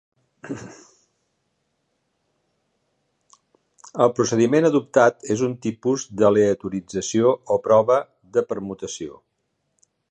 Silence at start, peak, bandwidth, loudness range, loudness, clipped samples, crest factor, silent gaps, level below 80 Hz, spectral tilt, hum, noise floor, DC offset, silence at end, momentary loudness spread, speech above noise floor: 0.45 s; -2 dBFS; 9.4 kHz; 4 LU; -20 LUFS; under 0.1%; 20 dB; none; -62 dBFS; -5.5 dB/octave; none; -74 dBFS; under 0.1%; 1 s; 17 LU; 54 dB